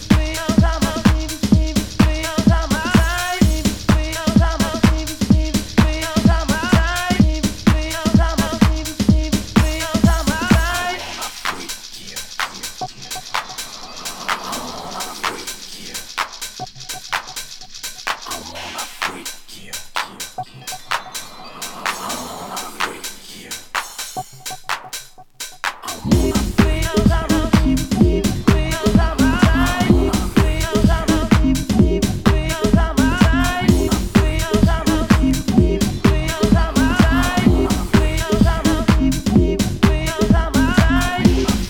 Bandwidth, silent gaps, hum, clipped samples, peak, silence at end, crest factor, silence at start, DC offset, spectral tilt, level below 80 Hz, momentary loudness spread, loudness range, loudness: 19 kHz; none; none; under 0.1%; 0 dBFS; 0 s; 16 dB; 0 s; under 0.1%; -5 dB/octave; -24 dBFS; 13 LU; 10 LU; -18 LUFS